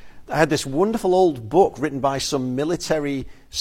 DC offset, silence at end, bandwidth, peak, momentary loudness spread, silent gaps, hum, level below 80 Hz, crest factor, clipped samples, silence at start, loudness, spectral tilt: under 0.1%; 0 s; 16.5 kHz; -4 dBFS; 9 LU; none; none; -46 dBFS; 18 dB; under 0.1%; 0 s; -21 LUFS; -5 dB/octave